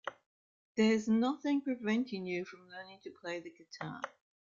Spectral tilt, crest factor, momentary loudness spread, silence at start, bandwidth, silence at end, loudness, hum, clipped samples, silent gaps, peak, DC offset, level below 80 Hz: -5.5 dB/octave; 18 dB; 18 LU; 0.05 s; 7.4 kHz; 0.35 s; -35 LUFS; none; under 0.1%; 0.26-0.75 s; -18 dBFS; under 0.1%; -78 dBFS